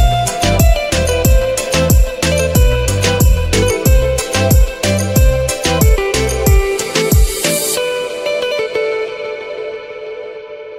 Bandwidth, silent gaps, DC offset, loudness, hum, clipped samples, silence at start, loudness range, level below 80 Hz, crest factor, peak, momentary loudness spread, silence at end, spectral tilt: 16.5 kHz; none; under 0.1%; -14 LUFS; none; under 0.1%; 0 s; 4 LU; -16 dBFS; 12 dB; 0 dBFS; 11 LU; 0 s; -4.5 dB/octave